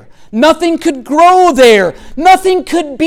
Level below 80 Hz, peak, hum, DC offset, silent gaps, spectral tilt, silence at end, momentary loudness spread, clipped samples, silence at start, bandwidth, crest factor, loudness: -38 dBFS; 0 dBFS; none; under 0.1%; none; -3.5 dB/octave; 0 s; 10 LU; under 0.1%; 0.35 s; 17 kHz; 8 dB; -9 LUFS